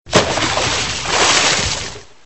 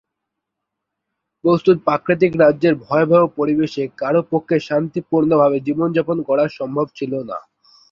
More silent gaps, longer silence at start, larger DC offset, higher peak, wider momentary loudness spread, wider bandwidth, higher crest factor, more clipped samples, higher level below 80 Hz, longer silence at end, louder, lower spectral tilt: neither; second, 0.05 s vs 1.45 s; first, 1% vs under 0.1%; about the same, 0 dBFS vs -2 dBFS; about the same, 9 LU vs 9 LU; first, 8.4 kHz vs 7 kHz; about the same, 18 dB vs 16 dB; neither; first, -36 dBFS vs -58 dBFS; second, 0.2 s vs 0.5 s; first, -14 LUFS vs -17 LUFS; second, -2 dB/octave vs -8.5 dB/octave